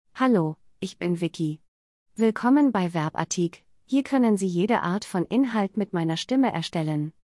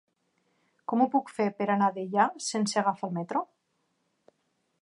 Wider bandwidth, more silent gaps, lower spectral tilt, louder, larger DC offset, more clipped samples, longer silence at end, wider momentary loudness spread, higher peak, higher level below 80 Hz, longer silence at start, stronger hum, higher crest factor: about the same, 12 kHz vs 11.5 kHz; first, 1.68-2.06 s vs none; about the same, -6 dB/octave vs -5 dB/octave; first, -25 LUFS vs -28 LUFS; neither; neither; second, 0.15 s vs 1.35 s; about the same, 10 LU vs 8 LU; about the same, -8 dBFS vs -10 dBFS; first, -66 dBFS vs -82 dBFS; second, 0.15 s vs 0.9 s; neither; about the same, 16 dB vs 20 dB